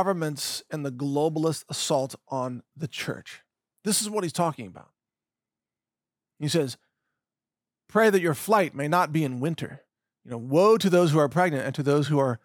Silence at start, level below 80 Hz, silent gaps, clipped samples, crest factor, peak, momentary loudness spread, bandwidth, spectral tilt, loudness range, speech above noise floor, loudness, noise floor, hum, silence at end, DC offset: 0 s; -76 dBFS; none; under 0.1%; 18 dB; -10 dBFS; 15 LU; 19.5 kHz; -5 dB/octave; 8 LU; over 65 dB; -25 LUFS; under -90 dBFS; none; 0.1 s; under 0.1%